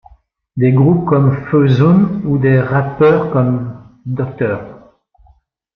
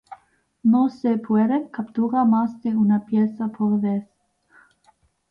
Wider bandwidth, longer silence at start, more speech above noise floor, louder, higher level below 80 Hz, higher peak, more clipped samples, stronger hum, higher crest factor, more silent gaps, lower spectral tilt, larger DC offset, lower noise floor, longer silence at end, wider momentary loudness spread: about the same, 5.2 kHz vs 5.2 kHz; first, 0.55 s vs 0.1 s; about the same, 40 dB vs 41 dB; first, -13 LUFS vs -21 LUFS; first, -46 dBFS vs -66 dBFS; first, -2 dBFS vs -10 dBFS; neither; neither; about the same, 12 dB vs 14 dB; neither; about the same, -10.5 dB/octave vs -10 dB/octave; neither; second, -52 dBFS vs -61 dBFS; second, 1 s vs 1.25 s; first, 13 LU vs 6 LU